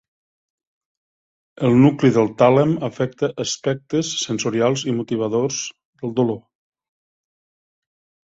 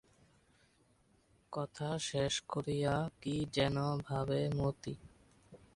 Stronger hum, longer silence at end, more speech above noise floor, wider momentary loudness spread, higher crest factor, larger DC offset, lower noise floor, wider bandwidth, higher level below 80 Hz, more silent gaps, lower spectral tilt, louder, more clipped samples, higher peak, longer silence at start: neither; first, 1.9 s vs 0.2 s; first, over 72 dB vs 35 dB; about the same, 10 LU vs 10 LU; about the same, 18 dB vs 20 dB; neither; first, under -90 dBFS vs -71 dBFS; second, 8 kHz vs 11.5 kHz; about the same, -58 dBFS vs -60 dBFS; first, 5.85-5.93 s vs none; about the same, -5.5 dB/octave vs -5.5 dB/octave; first, -19 LUFS vs -37 LUFS; neither; first, -2 dBFS vs -18 dBFS; about the same, 1.6 s vs 1.5 s